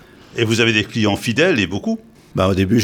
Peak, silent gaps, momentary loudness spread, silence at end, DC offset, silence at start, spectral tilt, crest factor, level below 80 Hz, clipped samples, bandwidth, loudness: -2 dBFS; none; 11 LU; 0 s; under 0.1%; 0.35 s; -5 dB/octave; 16 dB; -48 dBFS; under 0.1%; 18 kHz; -17 LUFS